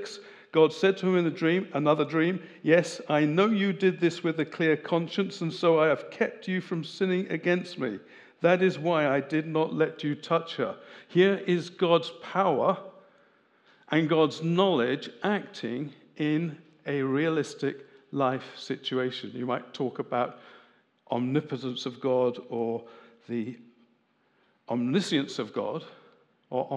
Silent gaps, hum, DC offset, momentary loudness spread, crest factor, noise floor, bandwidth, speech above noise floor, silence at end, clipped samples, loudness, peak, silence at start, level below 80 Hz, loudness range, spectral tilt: none; none; under 0.1%; 11 LU; 20 dB; -69 dBFS; 10 kHz; 42 dB; 0 s; under 0.1%; -28 LUFS; -8 dBFS; 0 s; -88 dBFS; 7 LU; -6.5 dB/octave